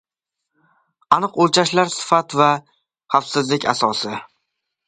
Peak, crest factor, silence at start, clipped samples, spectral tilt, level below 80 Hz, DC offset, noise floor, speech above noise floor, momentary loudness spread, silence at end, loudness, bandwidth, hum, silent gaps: 0 dBFS; 20 dB; 1.1 s; under 0.1%; -4 dB/octave; -64 dBFS; under 0.1%; -82 dBFS; 64 dB; 8 LU; 0.6 s; -18 LUFS; 9.6 kHz; none; none